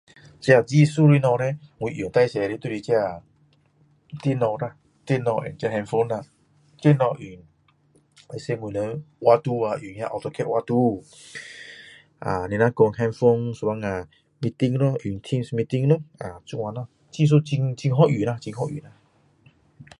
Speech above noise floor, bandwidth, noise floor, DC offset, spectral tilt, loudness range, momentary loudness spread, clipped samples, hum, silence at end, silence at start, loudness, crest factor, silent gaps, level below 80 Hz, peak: 39 dB; 11 kHz; -61 dBFS; under 0.1%; -7.5 dB/octave; 4 LU; 17 LU; under 0.1%; none; 0.15 s; 0.4 s; -23 LUFS; 20 dB; none; -56 dBFS; -2 dBFS